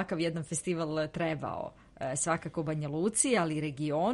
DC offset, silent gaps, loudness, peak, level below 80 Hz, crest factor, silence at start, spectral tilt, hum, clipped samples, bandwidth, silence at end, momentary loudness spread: under 0.1%; none; -32 LUFS; -12 dBFS; -62 dBFS; 20 dB; 0 s; -4.5 dB/octave; none; under 0.1%; 11.5 kHz; 0 s; 10 LU